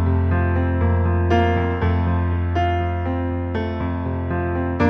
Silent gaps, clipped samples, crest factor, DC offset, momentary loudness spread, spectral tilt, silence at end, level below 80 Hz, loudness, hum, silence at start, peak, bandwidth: none; under 0.1%; 14 dB; under 0.1%; 6 LU; -9 dB/octave; 0 s; -30 dBFS; -21 LUFS; none; 0 s; -6 dBFS; 5.6 kHz